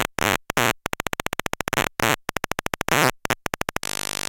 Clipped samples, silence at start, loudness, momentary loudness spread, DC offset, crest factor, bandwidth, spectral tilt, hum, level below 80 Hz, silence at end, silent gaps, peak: under 0.1%; 0 s; -24 LUFS; 8 LU; under 0.1%; 24 dB; 17.5 kHz; -2.5 dB/octave; none; -44 dBFS; 0.55 s; none; -2 dBFS